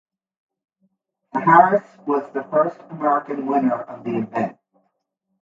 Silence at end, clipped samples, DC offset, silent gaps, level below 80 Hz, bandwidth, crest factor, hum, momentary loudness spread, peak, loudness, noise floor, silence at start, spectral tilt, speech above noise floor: 0.9 s; under 0.1%; under 0.1%; none; -72 dBFS; 7.4 kHz; 22 dB; none; 13 LU; 0 dBFS; -20 LUFS; -75 dBFS; 1.35 s; -9 dB/octave; 56 dB